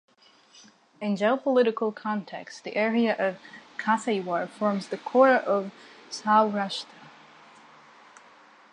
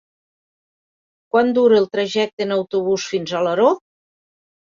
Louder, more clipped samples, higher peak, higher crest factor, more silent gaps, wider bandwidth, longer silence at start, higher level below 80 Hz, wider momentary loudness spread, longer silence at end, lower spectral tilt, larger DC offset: second, -26 LUFS vs -18 LUFS; neither; second, -6 dBFS vs -2 dBFS; about the same, 20 dB vs 18 dB; second, none vs 2.33-2.37 s; first, 10.5 kHz vs 7.6 kHz; second, 1 s vs 1.35 s; second, -82 dBFS vs -64 dBFS; first, 17 LU vs 7 LU; first, 1.65 s vs 0.9 s; about the same, -5.5 dB/octave vs -5 dB/octave; neither